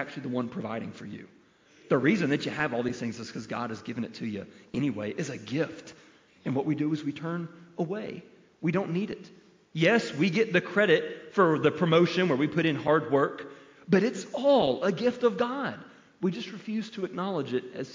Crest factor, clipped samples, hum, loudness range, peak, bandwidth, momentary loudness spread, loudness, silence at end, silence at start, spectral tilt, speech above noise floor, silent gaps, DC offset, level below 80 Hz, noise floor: 18 dB; under 0.1%; none; 8 LU; -10 dBFS; 7.6 kHz; 14 LU; -28 LUFS; 0 s; 0 s; -6.5 dB/octave; 30 dB; none; under 0.1%; -68 dBFS; -58 dBFS